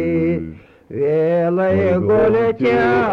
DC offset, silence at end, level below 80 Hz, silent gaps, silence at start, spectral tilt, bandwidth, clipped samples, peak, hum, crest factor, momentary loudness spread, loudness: under 0.1%; 0 s; -44 dBFS; none; 0 s; -9 dB/octave; 6.4 kHz; under 0.1%; -6 dBFS; none; 10 dB; 9 LU; -16 LUFS